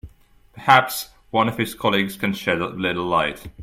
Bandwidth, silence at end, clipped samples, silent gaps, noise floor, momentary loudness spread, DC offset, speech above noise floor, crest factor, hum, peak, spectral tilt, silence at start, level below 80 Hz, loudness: 16.5 kHz; 0 s; under 0.1%; none; -52 dBFS; 11 LU; under 0.1%; 32 dB; 22 dB; none; 0 dBFS; -4.5 dB/octave; 0.05 s; -50 dBFS; -21 LUFS